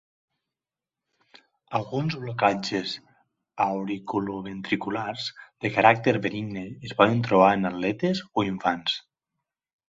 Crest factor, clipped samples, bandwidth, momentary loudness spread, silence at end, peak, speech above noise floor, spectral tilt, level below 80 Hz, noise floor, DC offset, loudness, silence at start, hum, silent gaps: 24 dB; under 0.1%; 7.8 kHz; 14 LU; 0.9 s; -4 dBFS; over 65 dB; -6 dB/octave; -62 dBFS; under -90 dBFS; under 0.1%; -25 LUFS; 1.7 s; none; none